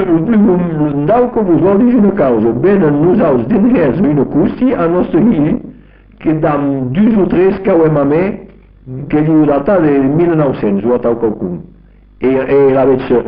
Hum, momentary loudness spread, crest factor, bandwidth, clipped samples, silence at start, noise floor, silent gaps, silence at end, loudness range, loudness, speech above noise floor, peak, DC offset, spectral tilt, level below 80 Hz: none; 7 LU; 10 dB; 5 kHz; under 0.1%; 0 s; -40 dBFS; none; 0 s; 3 LU; -11 LUFS; 30 dB; -2 dBFS; under 0.1%; -8.5 dB/octave; -38 dBFS